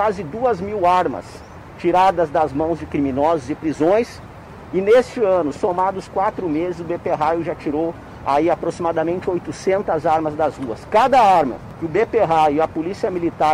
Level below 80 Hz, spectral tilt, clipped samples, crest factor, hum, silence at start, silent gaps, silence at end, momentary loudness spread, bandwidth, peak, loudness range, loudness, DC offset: -46 dBFS; -6.5 dB/octave; under 0.1%; 14 dB; none; 0 s; none; 0 s; 10 LU; 14.5 kHz; -6 dBFS; 4 LU; -19 LUFS; under 0.1%